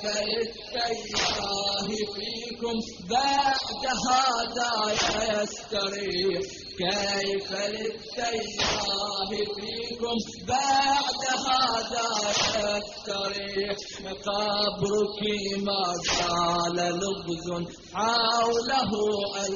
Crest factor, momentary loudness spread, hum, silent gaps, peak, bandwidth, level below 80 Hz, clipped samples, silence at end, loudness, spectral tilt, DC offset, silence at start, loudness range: 16 dB; 9 LU; none; none; -12 dBFS; 7.4 kHz; -54 dBFS; under 0.1%; 0 s; -27 LUFS; -1.5 dB/octave; under 0.1%; 0 s; 3 LU